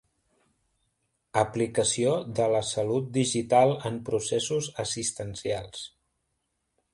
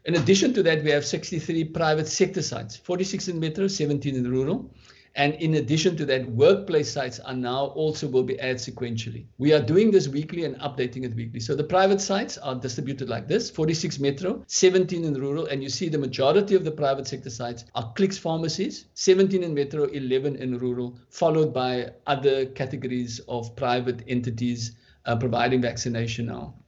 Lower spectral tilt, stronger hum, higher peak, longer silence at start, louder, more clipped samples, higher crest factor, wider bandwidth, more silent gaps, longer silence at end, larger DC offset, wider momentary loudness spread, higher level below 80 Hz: about the same, -4 dB/octave vs -5 dB/octave; neither; about the same, -6 dBFS vs -6 dBFS; first, 1.35 s vs 0.05 s; about the same, -27 LUFS vs -25 LUFS; neither; about the same, 22 dB vs 18 dB; first, 11.5 kHz vs 8 kHz; neither; first, 1.05 s vs 0.15 s; neither; about the same, 10 LU vs 11 LU; about the same, -60 dBFS vs -56 dBFS